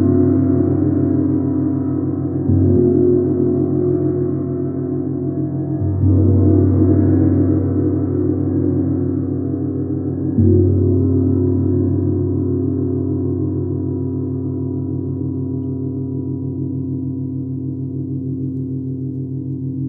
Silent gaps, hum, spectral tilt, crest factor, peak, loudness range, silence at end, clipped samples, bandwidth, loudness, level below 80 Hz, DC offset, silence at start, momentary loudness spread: none; none; -15 dB/octave; 14 dB; -2 dBFS; 8 LU; 0 s; under 0.1%; 1.9 kHz; -18 LUFS; -50 dBFS; under 0.1%; 0 s; 10 LU